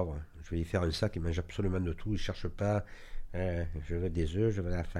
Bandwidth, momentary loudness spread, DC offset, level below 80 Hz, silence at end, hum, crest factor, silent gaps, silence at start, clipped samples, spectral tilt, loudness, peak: 11.5 kHz; 8 LU; under 0.1%; -42 dBFS; 0 s; none; 16 dB; none; 0 s; under 0.1%; -7 dB/octave; -35 LUFS; -16 dBFS